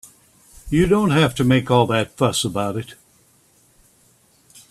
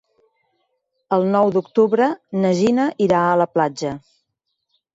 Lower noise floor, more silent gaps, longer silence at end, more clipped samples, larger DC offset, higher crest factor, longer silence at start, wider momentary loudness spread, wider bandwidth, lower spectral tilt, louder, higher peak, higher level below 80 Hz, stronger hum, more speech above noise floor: second, -57 dBFS vs -75 dBFS; neither; first, 1.75 s vs 0.95 s; neither; neither; about the same, 20 dB vs 16 dB; second, 0.65 s vs 1.1 s; first, 9 LU vs 6 LU; first, 14.5 kHz vs 8 kHz; second, -5.5 dB/octave vs -7 dB/octave; about the same, -19 LUFS vs -18 LUFS; about the same, -2 dBFS vs -4 dBFS; first, -42 dBFS vs -60 dBFS; neither; second, 39 dB vs 58 dB